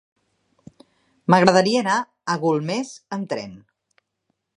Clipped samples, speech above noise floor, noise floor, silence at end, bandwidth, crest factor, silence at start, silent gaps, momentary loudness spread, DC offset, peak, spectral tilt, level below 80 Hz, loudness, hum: under 0.1%; 55 dB; -75 dBFS; 1 s; 11 kHz; 22 dB; 1.3 s; none; 15 LU; under 0.1%; 0 dBFS; -5 dB/octave; -64 dBFS; -21 LUFS; none